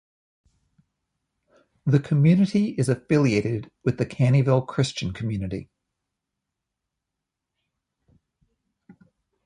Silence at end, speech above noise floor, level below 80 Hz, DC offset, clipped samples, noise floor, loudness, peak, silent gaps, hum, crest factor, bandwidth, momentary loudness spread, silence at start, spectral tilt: 3.8 s; 63 dB; -54 dBFS; under 0.1%; under 0.1%; -84 dBFS; -23 LUFS; -6 dBFS; none; none; 20 dB; 11.5 kHz; 11 LU; 1.85 s; -7.5 dB/octave